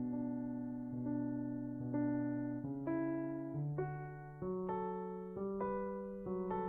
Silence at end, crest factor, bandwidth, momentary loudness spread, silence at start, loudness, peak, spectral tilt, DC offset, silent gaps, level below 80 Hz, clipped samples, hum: 0 s; 14 dB; 3.3 kHz; 5 LU; 0 s; -41 LUFS; -26 dBFS; -11.5 dB/octave; under 0.1%; none; -66 dBFS; under 0.1%; none